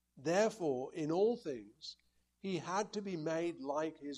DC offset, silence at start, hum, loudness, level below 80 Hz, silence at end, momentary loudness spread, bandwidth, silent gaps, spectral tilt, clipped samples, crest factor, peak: under 0.1%; 0.15 s; none; -37 LUFS; -78 dBFS; 0 s; 14 LU; 12 kHz; none; -5 dB/octave; under 0.1%; 18 dB; -20 dBFS